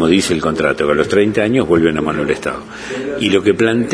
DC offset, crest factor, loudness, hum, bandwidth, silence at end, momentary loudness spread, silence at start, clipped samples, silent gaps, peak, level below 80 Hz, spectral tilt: under 0.1%; 14 dB; -15 LUFS; none; 11 kHz; 0 s; 10 LU; 0 s; under 0.1%; none; 0 dBFS; -42 dBFS; -5 dB/octave